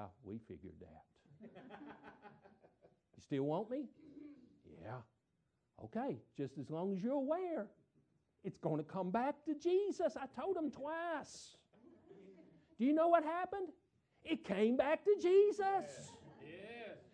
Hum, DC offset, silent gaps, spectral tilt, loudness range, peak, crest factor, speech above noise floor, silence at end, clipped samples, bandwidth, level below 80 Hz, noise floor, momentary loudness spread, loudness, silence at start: none; under 0.1%; none; -6.5 dB/octave; 11 LU; -20 dBFS; 20 dB; 45 dB; 0.15 s; under 0.1%; 9.6 kHz; -80 dBFS; -83 dBFS; 23 LU; -38 LUFS; 0 s